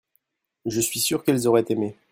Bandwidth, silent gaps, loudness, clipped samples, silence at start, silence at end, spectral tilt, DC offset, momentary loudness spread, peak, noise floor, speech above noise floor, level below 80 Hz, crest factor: 16.5 kHz; none; -22 LUFS; under 0.1%; 0.65 s; 0.2 s; -4 dB/octave; under 0.1%; 8 LU; -6 dBFS; -71 dBFS; 49 dB; -62 dBFS; 18 dB